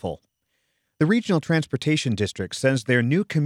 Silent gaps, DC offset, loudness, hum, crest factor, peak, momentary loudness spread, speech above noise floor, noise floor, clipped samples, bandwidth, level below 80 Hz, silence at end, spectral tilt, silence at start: none; under 0.1%; -23 LUFS; none; 18 dB; -6 dBFS; 6 LU; 52 dB; -74 dBFS; under 0.1%; 13 kHz; -58 dBFS; 0 s; -6 dB/octave; 0.05 s